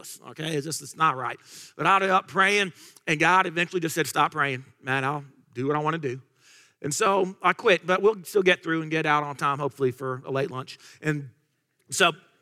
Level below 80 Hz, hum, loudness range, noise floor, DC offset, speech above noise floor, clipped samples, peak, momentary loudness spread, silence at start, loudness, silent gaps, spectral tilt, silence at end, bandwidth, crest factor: -74 dBFS; none; 5 LU; -71 dBFS; under 0.1%; 46 dB; under 0.1%; -6 dBFS; 13 LU; 0.05 s; -25 LUFS; none; -4 dB/octave; 0.25 s; 16 kHz; 20 dB